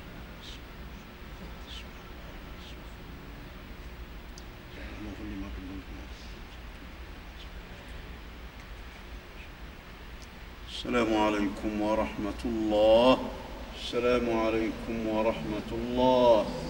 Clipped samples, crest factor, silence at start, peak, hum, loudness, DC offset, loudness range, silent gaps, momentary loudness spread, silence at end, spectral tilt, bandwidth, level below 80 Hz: under 0.1%; 22 dB; 0 s; -10 dBFS; none; -28 LUFS; under 0.1%; 18 LU; none; 21 LU; 0 s; -6 dB/octave; 16 kHz; -46 dBFS